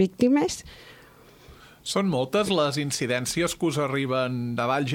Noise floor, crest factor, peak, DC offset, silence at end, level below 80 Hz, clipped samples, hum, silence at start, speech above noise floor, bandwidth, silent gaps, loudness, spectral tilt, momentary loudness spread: -52 dBFS; 16 dB; -10 dBFS; under 0.1%; 0 s; -56 dBFS; under 0.1%; none; 0 s; 27 dB; 17 kHz; none; -25 LUFS; -5 dB/octave; 7 LU